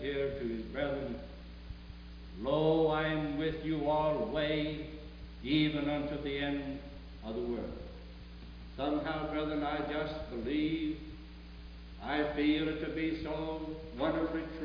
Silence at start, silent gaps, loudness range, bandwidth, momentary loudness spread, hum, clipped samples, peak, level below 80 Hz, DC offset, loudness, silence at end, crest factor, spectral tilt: 0 s; none; 5 LU; 5.2 kHz; 19 LU; none; under 0.1%; -16 dBFS; -50 dBFS; under 0.1%; -35 LUFS; 0 s; 18 dB; -4.5 dB/octave